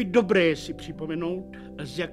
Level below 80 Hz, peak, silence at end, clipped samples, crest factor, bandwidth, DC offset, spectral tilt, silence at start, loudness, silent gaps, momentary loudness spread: -52 dBFS; -8 dBFS; 0 s; under 0.1%; 18 dB; 13 kHz; under 0.1%; -6 dB/octave; 0 s; -26 LUFS; none; 16 LU